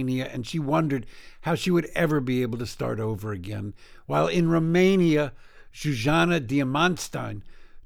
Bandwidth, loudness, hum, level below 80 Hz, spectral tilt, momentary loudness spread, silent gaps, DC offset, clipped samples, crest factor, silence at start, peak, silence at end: 17 kHz; -25 LUFS; none; -46 dBFS; -6 dB/octave; 12 LU; none; under 0.1%; under 0.1%; 16 dB; 0 s; -8 dBFS; 0 s